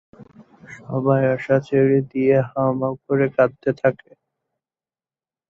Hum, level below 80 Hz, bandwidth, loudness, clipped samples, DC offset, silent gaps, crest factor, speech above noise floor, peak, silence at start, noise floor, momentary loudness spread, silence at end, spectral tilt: none; -60 dBFS; 7 kHz; -20 LUFS; under 0.1%; under 0.1%; none; 18 dB; over 71 dB; -2 dBFS; 0.2 s; under -90 dBFS; 7 LU; 1.55 s; -9.5 dB/octave